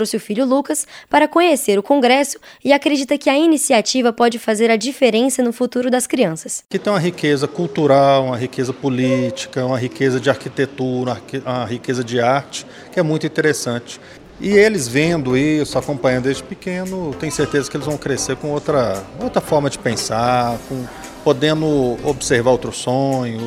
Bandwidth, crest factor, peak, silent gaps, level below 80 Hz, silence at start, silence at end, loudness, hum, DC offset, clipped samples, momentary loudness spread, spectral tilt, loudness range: 16 kHz; 16 dB; 0 dBFS; none; -48 dBFS; 0 s; 0 s; -17 LUFS; none; under 0.1%; under 0.1%; 10 LU; -4.5 dB/octave; 5 LU